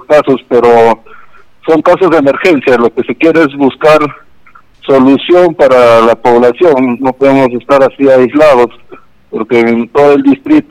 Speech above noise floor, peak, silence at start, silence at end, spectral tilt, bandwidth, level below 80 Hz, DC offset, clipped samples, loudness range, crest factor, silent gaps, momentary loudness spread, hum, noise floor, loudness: 35 dB; 0 dBFS; 0.1 s; 0.1 s; -6.5 dB/octave; 13 kHz; -42 dBFS; under 0.1%; 2%; 2 LU; 8 dB; none; 6 LU; none; -42 dBFS; -7 LUFS